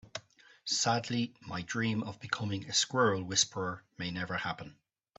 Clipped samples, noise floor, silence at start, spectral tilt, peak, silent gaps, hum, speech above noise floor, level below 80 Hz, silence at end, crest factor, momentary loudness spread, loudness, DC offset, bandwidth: under 0.1%; -58 dBFS; 0.05 s; -3 dB/octave; -14 dBFS; none; none; 25 dB; -70 dBFS; 0.45 s; 20 dB; 14 LU; -32 LUFS; under 0.1%; 8.4 kHz